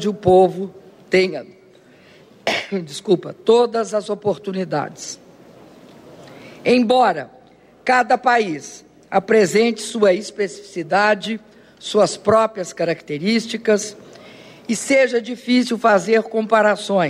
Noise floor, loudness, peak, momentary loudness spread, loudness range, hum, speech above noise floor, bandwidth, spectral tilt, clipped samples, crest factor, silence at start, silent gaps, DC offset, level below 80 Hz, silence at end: -49 dBFS; -18 LUFS; -2 dBFS; 14 LU; 4 LU; none; 31 dB; 14.5 kHz; -4.5 dB/octave; under 0.1%; 16 dB; 0 s; none; under 0.1%; -60 dBFS; 0 s